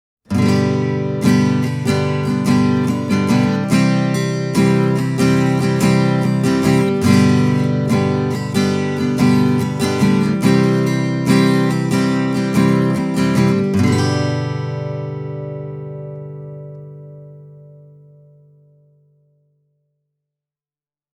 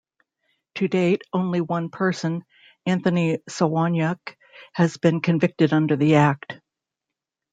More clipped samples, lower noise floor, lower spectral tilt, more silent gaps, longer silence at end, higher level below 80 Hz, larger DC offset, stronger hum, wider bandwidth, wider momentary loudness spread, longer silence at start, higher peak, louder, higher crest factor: neither; first, under -90 dBFS vs -86 dBFS; about the same, -6.5 dB/octave vs -7 dB/octave; neither; first, 3.45 s vs 0.95 s; first, -52 dBFS vs -64 dBFS; neither; neither; first, 15.5 kHz vs 9 kHz; about the same, 13 LU vs 14 LU; second, 0.3 s vs 0.75 s; about the same, -2 dBFS vs -4 dBFS; first, -16 LUFS vs -22 LUFS; about the same, 16 dB vs 18 dB